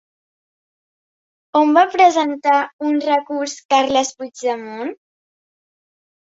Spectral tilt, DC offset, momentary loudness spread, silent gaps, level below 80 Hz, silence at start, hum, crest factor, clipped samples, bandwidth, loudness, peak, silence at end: -2 dB/octave; under 0.1%; 12 LU; 2.73-2.79 s, 3.65-3.69 s; -64 dBFS; 1.55 s; none; 18 dB; under 0.1%; 8 kHz; -17 LUFS; -2 dBFS; 1.25 s